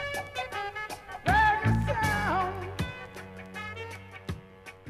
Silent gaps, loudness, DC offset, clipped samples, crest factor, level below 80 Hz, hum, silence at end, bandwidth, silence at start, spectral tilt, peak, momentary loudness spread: none; -29 LUFS; under 0.1%; under 0.1%; 20 dB; -44 dBFS; none; 0 s; 14.5 kHz; 0 s; -5.5 dB/octave; -12 dBFS; 18 LU